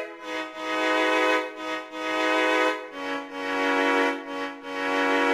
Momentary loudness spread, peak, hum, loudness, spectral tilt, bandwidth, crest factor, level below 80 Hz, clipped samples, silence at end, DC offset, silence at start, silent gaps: 11 LU; -10 dBFS; none; -25 LUFS; -2 dB/octave; 15.5 kHz; 16 dB; -68 dBFS; under 0.1%; 0 s; under 0.1%; 0 s; none